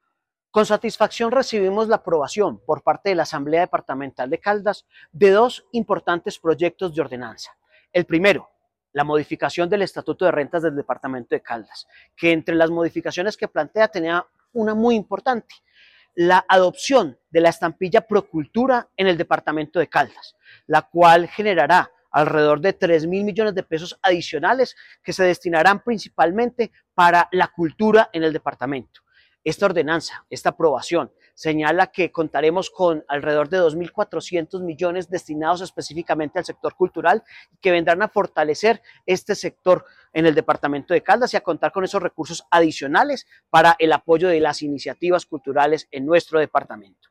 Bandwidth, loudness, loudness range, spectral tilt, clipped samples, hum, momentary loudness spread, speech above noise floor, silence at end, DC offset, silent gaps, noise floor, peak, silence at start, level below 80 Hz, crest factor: 13.5 kHz; -20 LUFS; 5 LU; -5 dB/octave; under 0.1%; none; 10 LU; 57 dB; 0.3 s; under 0.1%; none; -77 dBFS; -4 dBFS; 0.55 s; -60 dBFS; 16 dB